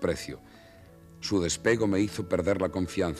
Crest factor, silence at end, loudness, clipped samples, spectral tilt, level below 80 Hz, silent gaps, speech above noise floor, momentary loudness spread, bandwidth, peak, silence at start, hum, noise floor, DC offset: 18 dB; 0 s; -28 LUFS; under 0.1%; -5 dB/octave; -52 dBFS; none; 24 dB; 12 LU; 14.5 kHz; -12 dBFS; 0 s; none; -52 dBFS; under 0.1%